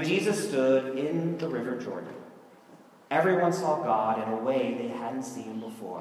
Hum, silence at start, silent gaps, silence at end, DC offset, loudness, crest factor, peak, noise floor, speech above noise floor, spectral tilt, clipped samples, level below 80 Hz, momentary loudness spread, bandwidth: none; 0 s; none; 0 s; under 0.1%; -28 LUFS; 18 dB; -10 dBFS; -54 dBFS; 26 dB; -5.5 dB/octave; under 0.1%; -82 dBFS; 13 LU; 15 kHz